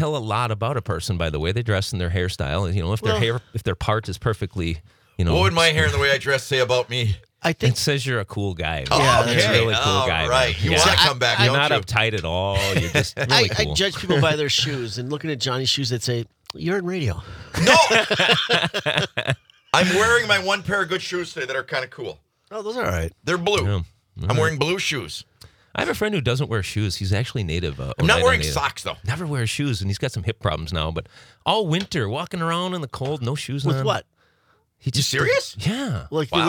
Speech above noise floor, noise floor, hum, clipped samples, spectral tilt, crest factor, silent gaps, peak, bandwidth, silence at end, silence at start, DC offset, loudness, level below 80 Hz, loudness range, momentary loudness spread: 42 dB; -63 dBFS; none; under 0.1%; -4 dB/octave; 20 dB; none; -2 dBFS; 19.5 kHz; 0 s; 0 s; under 0.1%; -21 LUFS; -44 dBFS; 7 LU; 11 LU